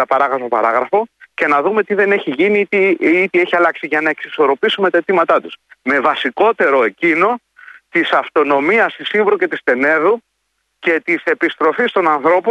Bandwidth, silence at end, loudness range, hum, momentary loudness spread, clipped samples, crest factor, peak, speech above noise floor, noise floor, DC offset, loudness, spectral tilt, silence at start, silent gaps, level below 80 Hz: 8.8 kHz; 0 s; 1 LU; none; 5 LU; under 0.1%; 14 dB; -2 dBFS; 54 dB; -68 dBFS; under 0.1%; -14 LUFS; -6 dB/octave; 0 s; none; -66 dBFS